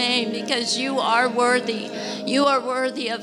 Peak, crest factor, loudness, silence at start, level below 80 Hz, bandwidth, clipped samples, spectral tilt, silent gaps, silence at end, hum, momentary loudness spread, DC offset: -6 dBFS; 16 dB; -21 LUFS; 0 s; -76 dBFS; 13.5 kHz; under 0.1%; -2.5 dB/octave; none; 0 s; none; 9 LU; under 0.1%